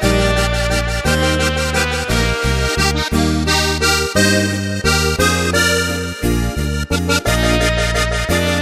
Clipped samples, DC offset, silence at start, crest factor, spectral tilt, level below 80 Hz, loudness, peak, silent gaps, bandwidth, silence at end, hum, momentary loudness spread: under 0.1%; under 0.1%; 0 s; 16 dB; -4 dB/octave; -24 dBFS; -16 LUFS; 0 dBFS; none; 16 kHz; 0 s; none; 5 LU